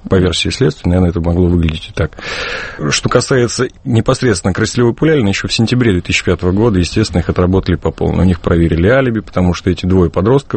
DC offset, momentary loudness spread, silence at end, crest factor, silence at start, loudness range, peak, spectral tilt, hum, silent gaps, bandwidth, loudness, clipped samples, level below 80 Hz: under 0.1%; 6 LU; 0 s; 12 dB; 0.05 s; 2 LU; 0 dBFS; -6 dB/octave; none; none; 8.8 kHz; -13 LUFS; under 0.1%; -28 dBFS